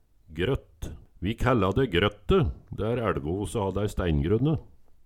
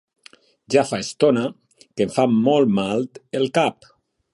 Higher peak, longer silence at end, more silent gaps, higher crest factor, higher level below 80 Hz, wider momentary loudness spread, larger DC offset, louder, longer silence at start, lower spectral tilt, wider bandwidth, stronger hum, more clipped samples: about the same, -6 dBFS vs -4 dBFS; second, 0.15 s vs 0.6 s; neither; about the same, 20 dB vs 18 dB; first, -38 dBFS vs -62 dBFS; about the same, 10 LU vs 9 LU; neither; second, -27 LUFS vs -20 LUFS; second, 0.3 s vs 0.7 s; first, -7 dB/octave vs -5.5 dB/octave; first, 14 kHz vs 11.5 kHz; neither; neither